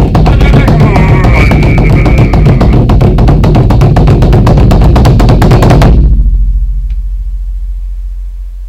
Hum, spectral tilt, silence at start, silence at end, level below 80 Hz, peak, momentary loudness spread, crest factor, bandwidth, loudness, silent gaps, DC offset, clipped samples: none; -8 dB/octave; 0 s; 0 s; -8 dBFS; 0 dBFS; 14 LU; 4 dB; 12 kHz; -6 LUFS; none; under 0.1%; 8%